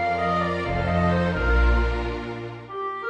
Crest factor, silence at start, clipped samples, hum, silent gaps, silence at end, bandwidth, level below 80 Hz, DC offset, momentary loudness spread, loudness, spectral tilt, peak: 14 dB; 0 s; under 0.1%; none; none; 0 s; 7.8 kHz; -28 dBFS; under 0.1%; 11 LU; -24 LUFS; -7.5 dB/octave; -10 dBFS